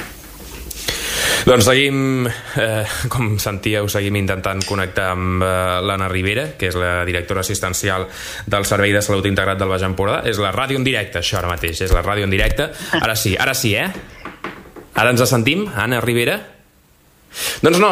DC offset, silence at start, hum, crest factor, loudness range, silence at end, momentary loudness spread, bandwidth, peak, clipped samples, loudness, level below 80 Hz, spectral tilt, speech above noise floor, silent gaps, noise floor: under 0.1%; 0 s; none; 18 dB; 2 LU; 0 s; 10 LU; 16 kHz; 0 dBFS; under 0.1%; -18 LUFS; -32 dBFS; -4 dB/octave; 35 dB; none; -52 dBFS